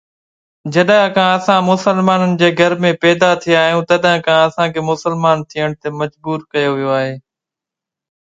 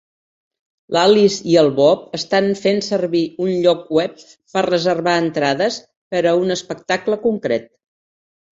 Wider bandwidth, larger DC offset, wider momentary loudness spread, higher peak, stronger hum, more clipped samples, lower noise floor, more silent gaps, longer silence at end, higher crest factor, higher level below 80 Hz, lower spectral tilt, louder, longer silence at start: first, 9.2 kHz vs 7.8 kHz; neither; about the same, 9 LU vs 8 LU; about the same, 0 dBFS vs -2 dBFS; neither; neither; second, -85 dBFS vs under -90 dBFS; second, none vs 5.97-6.11 s; first, 1.1 s vs 0.9 s; about the same, 14 dB vs 16 dB; about the same, -56 dBFS vs -60 dBFS; about the same, -5.5 dB/octave vs -5 dB/octave; first, -14 LUFS vs -17 LUFS; second, 0.65 s vs 0.9 s